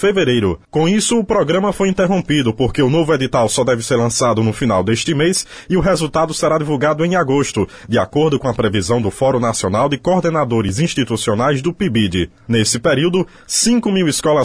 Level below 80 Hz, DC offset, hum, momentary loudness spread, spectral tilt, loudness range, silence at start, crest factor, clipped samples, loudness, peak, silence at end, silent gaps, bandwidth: -40 dBFS; 0.3%; none; 3 LU; -5 dB/octave; 1 LU; 0 s; 12 dB; under 0.1%; -16 LUFS; -2 dBFS; 0 s; none; 11 kHz